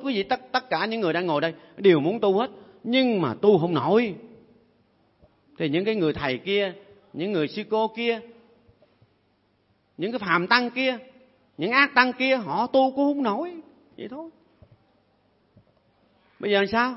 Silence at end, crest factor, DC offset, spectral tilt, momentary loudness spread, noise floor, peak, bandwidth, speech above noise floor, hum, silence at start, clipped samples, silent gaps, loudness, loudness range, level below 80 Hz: 0 s; 24 dB; under 0.1%; -8.5 dB/octave; 14 LU; -67 dBFS; -2 dBFS; 6 kHz; 43 dB; none; 0 s; under 0.1%; none; -23 LUFS; 8 LU; -64 dBFS